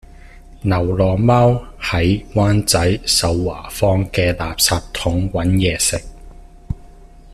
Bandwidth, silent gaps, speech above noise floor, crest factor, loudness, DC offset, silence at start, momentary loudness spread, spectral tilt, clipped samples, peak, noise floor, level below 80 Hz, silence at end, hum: 14 kHz; none; 24 dB; 18 dB; -17 LUFS; under 0.1%; 0.35 s; 10 LU; -4.5 dB/octave; under 0.1%; 0 dBFS; -40 dBFS; -34 dBFS; 0 s; none